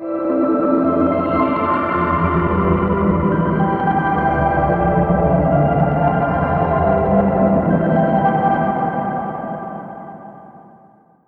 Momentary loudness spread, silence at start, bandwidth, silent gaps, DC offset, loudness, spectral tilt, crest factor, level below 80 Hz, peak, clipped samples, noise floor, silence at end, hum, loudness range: 9 LU; 0 s; 4.5 kHz; none; under 0.1%; -17 LUFS; -11 dB/octave; 14 dB; -34 dBFS; -2 dBFS; under 0.1%; -50 dBFS; 0.65 s; none; 3 LU